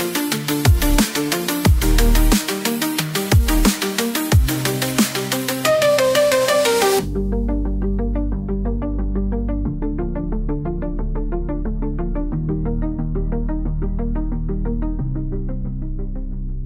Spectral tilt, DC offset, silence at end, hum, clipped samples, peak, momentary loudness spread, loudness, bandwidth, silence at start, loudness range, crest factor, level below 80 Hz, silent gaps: -5 dB/octave; under 0.1%; 0 s; none; under 0.1%; 0 dBFS; 10 LU; -20 LUFS; 16.5 kHz; 0 s; 7 LU; 18 dB; -22 dBFS; none